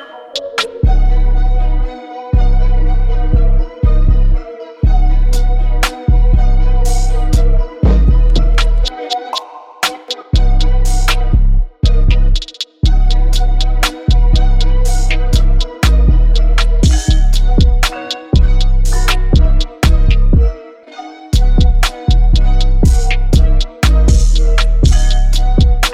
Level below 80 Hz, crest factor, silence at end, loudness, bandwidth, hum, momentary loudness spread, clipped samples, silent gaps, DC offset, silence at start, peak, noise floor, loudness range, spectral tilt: -10 dBFS; 8 dB; 0 s; -14 LUFS; 12.5 kHz; none; 6 LU; under 0.1%; none; under 0.1%; 0 s; 0 dBFS; -32 dBFS; 3 LU; -5 dB/octave